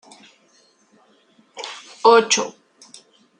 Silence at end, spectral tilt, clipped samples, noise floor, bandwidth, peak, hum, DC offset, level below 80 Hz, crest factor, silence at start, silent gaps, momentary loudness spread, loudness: 0.9 s; -1 dB/octave; under 0.1%; -58 dBFS; 10 kHz; -2 dBFS; none; under 0.1%; -72 dBFS; 22 dB; 1.55 s; none; 20 LU; -16 LUFS